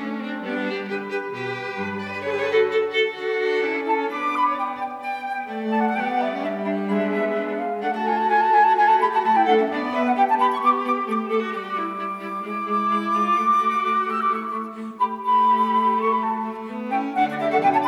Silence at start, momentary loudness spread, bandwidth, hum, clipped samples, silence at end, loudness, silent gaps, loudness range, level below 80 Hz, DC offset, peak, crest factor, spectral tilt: 0 s; 10 LU; 12.5 kHz; none; under 0.1%; 0 s; -22 LUFS; none; 5 LU; -74 dBFS; under 0.1%; -6 dBFS; 16 dB; -6 dB/octave